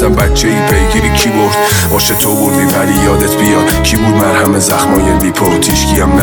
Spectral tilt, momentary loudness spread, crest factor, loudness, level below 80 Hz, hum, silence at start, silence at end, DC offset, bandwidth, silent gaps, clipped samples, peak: -4.5 dB/octave; 1 LU; 10 dB; -9 LUFS; -18 dBFS; none; 0 s; 0 s; under 0.1%; over 20 kHz; none; under 0.1%; 0 dBFS